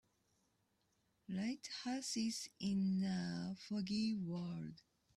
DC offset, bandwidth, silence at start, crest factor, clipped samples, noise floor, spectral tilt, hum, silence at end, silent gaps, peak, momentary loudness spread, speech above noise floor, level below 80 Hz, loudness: under 0.1%; 13 kHz; 1.3 s; 14 dB; under 0.1%; -81 dBFS; -5 dB/octave; none; 0.4 s; none; -30 dBFS; 8 LU; 40 dB; -76 dBFS; -42 LUFS